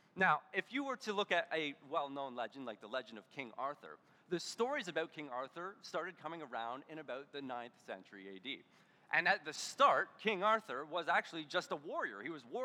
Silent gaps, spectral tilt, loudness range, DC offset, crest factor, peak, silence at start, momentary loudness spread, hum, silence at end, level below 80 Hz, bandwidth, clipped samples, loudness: none; -3.5 dB/octave; 10 LU; under 0.1%; 22 dB; -18 dBFS; 0.15 s; 15 LU; none; 0 s; under -90 dBFS; 16.5 kHz; under 0.1%; -39 LUFS